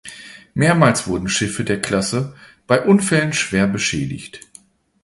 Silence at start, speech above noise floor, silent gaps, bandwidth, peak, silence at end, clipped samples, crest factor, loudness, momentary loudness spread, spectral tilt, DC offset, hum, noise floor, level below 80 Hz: 0.05 s; 31 dB; none; 11.5 kHz; 0 dBFS; 0.65 s; under 0.1%; 18 dB; -18 LUFS; 16 LU; -4.5 dB/octave; under 0.1%; none; -49 dBFS; -46 dBFS